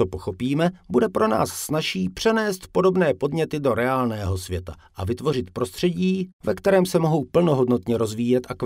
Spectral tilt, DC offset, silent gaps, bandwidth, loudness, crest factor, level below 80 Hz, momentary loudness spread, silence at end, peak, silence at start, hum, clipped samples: -6 dB/octave; under 0.1%; 6.33-6.39 s; 16 kHz; -23 LUFS; 16 dB; -52 dBFS; 8 LU; 0 s; -6 dBFS; 0 s; none; under 0.1%